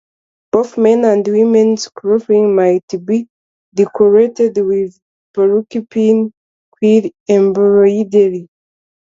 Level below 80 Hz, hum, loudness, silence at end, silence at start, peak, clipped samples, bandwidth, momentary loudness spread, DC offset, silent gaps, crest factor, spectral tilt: -60 dBFS; none; -13 LUFS; 0.75 s; 0.55 s; 0 dBFS; under 0.1%; 7.6 kHz; 8 LU; under 0.1%; 2.83-2.88 s, 3.30-3.72 s, 5.02-5.34 s, 6.37-6.72 s, 7.20-7.26 s; 12 dB; -7 dB/octave